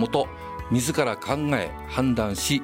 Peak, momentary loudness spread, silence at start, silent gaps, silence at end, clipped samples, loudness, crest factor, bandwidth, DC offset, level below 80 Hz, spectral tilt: -8 dBFS; 5 LU; 0 s; none; 0 s; under 0.1%; -25 LUFS; 16 dB; 16.5 kHz; under 0.1%; -44 dBFS; -4.5 dB/octave